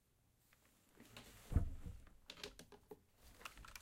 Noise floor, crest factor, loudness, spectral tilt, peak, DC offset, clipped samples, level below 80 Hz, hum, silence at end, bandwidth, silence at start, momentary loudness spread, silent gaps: -77 dBFS; 26 dB; -49 LUFS; -5.5 dB/octave; -22 dBFS; under 0.1%; under 0.1%; -52 dBFS; none; 0 s; 16.5 kHz; 0.95 s; 20 LU; none